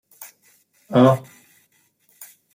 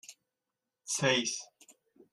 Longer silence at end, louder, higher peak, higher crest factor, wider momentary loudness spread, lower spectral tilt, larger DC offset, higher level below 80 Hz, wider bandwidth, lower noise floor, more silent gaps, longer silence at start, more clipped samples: first, 1.35 s vs 0.65 s; first, -18 LUFS vs -31 LUFS; first, -4 dBFS vs -14 dBFS; about the same, 20 dB vs 22 dB; about the same, 26 LU vs 24 LU; first, -7.5 dB/octave vs -2.5 dB/octave; neither; first, -66 dBFS vs -76 dBFS; first, 16.5 kHz vs 13.5 kHz; second, -63 dBFS vs -89 dBFS; neither; about the same, 0.2 s vs 0.1 s; neither